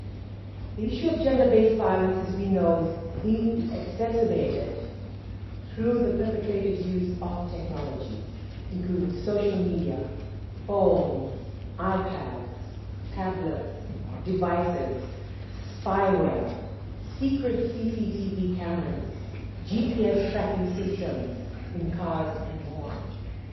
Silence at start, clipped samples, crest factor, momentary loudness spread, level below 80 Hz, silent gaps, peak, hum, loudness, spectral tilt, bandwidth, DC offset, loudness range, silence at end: 0 s; under 0.1%; 20 dB; 15 LU; -42 dBFS; none; -8 dBFS; none; -28 LUFS; -9 dB/octave; 6 kHz; under 0.1%; 6 LU; 0 s